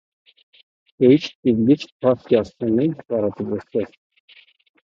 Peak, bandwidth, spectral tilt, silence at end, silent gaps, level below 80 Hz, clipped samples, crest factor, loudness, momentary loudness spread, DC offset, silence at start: -2 dBFS; 7.4 kHz; -8 dB/octave; 1 s; 1.35-1.43 s, 1.92-2.00 s; -56 dBFS; under 0.1%; 18 dB; -20 LUFS; 11 LU; under 0.1%; 1 s